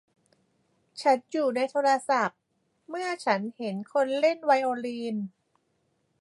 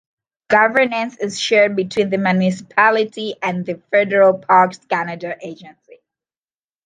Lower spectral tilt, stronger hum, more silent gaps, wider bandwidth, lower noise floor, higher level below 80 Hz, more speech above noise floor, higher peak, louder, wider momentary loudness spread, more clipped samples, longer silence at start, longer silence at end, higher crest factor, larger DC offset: about the same, -4.5 dB/octave vs -5 dB/octave; neither; neither; first, 11.5 kHz vs 9.6 kHz; second, -73 dBFS vs under -90 dBFS; second, -82 dBFS vs -66 dBFS; second, 47 dB vs over 73 dB; second, -10 dBFS vs -2 dBFS; second, -27 LUFS vs -16 LUFS; about the same, 10 LU vs 12 LU; neither; first, 0.95 s vs 0.5 s; second, 0.9 s vs 1.15 s; about the same, 20 dB vs 16 dB; neither